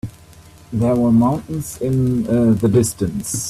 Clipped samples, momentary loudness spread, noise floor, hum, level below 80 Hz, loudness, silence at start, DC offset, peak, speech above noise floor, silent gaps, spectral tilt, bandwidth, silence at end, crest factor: under 0.1%; 10 LU; -43 dBFS; none; -42 dBFS; -17 LUFS; 0.05 s; under 0.1%; -2 dBFS; 27 dB; none; -7 dB/octave; 14 kHz; 0 s; 14 dB